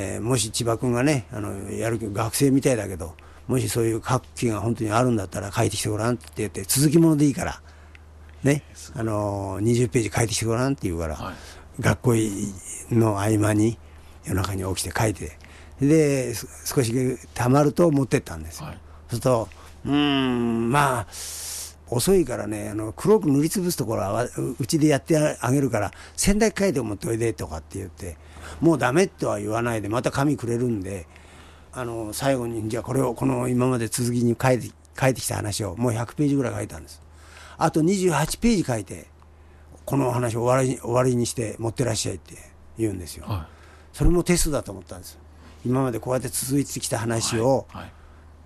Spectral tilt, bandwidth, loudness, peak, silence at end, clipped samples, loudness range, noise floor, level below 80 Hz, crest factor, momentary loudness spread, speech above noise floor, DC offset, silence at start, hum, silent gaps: -5.5 dB/octave; 13 kHz; -24 LUFS; -6 dBFS; 0.15 s; under 0.1%; 4 LU; -49 dBFS; -42 dBFS; 18 dB; 15 LU; 26 dB; under 0.1%; 0 s; none; none